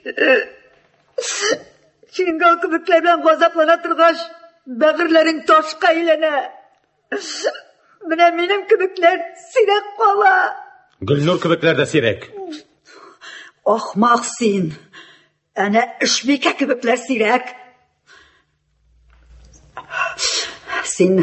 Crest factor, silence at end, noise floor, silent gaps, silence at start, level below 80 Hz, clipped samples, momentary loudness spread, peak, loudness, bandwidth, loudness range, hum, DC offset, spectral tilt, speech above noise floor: 16 dB; 0 s; -62 dBFS; none; 0.05 s; -58 dBFS; under 0.1%; 17 LU; -2 dBFS; -16 LUFS; 8.6 kHz; 6 LU; none; under 0.1%; -4 dB/octave; 46 dB